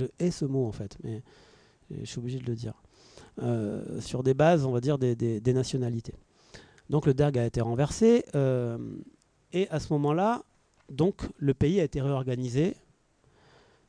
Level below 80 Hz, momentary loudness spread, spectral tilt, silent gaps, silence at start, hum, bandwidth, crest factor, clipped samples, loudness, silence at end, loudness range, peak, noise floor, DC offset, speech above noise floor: -52 dBFS; 16 LU; -7.5 dB/octave; none; 0 s; none; 10.5 kHz; 18 dB; under 0.1%; -28 LUFS; 1.15 s; 7 LU; -10 dBFS; -65 dBFS; under 0.1%; 37 dB